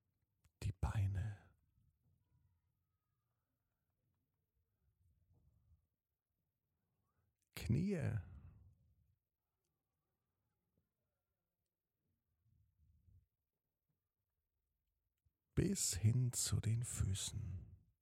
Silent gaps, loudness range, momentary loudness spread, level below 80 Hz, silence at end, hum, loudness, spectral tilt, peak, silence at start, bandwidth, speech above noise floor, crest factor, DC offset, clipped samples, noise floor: none; 10 LU; 13 LU; -60 dBFS; 0.25 s; none; -41 LUFS; -5 dB/octave; -24 dBFS; 0.6 s; 16 kHz; over 51 dB; 22 dB; under 0.1%; under 0.1%; under -90 dBFS